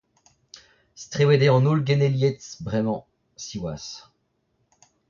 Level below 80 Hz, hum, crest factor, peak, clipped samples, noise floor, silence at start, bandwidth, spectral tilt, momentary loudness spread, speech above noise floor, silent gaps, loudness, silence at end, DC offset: -56 dBFS; none; 18 dB; -6 dBFS; under 0.1%; -71 dBFS; 1 s; 7.2 kHz; -6.5 dB/octave; 20 LU; 49 dB; none; -22 LUFS; 1.1 s; under 0.1%